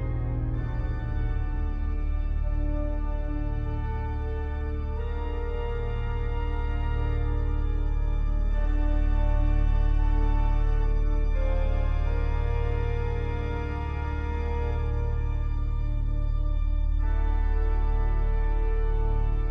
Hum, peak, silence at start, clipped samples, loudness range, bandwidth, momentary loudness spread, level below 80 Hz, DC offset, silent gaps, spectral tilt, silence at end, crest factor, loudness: none; -14 dBFS; 0 s; under 0.1%; 4 LU; 3.8 kHz; 5 LU; -26 dBFS; under 0.1%; none; -9 dB/octave; 0 s; 10 dB; -30 LUFS